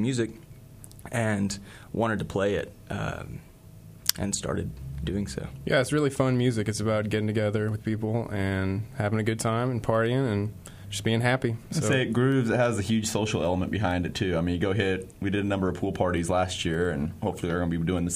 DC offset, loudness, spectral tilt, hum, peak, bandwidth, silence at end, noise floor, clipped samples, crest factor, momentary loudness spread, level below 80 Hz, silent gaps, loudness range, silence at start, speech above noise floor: under 0.1%; -27 LUFS; -5.5 dB/octave; none; 0 dBFS; 15.5 kHz; 0 s; -48 dBFS; under 0.1%; 28 dB; 9 LU; -48 dBFS; none; 5 LU; 0 s; 21 dB